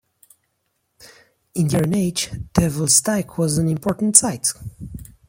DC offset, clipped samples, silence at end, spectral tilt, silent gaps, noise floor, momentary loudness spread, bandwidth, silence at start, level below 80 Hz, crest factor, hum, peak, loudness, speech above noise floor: under 0.1%; under 0.1%; 0.25 s; -4 dB/octave; none; -71 dBFS; 18 LU; 16.5 kHz; 1.05 s; -44 dBFS; 22 dB; none; 0 dBFS; -18 LUFS; 52 dB